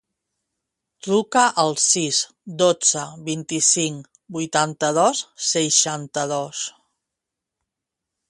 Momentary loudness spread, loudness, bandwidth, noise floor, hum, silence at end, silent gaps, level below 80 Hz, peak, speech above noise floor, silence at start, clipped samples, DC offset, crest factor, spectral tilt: 13 LU; -20 LUFS; 11.5 kHz; -84 dBFS; none; 1.6 s; none; -68 dBFS; -2 dBFS; 63 dB; 1.05 s; under 0.1%; under 0.1%; 22 dB; -2 dB/octave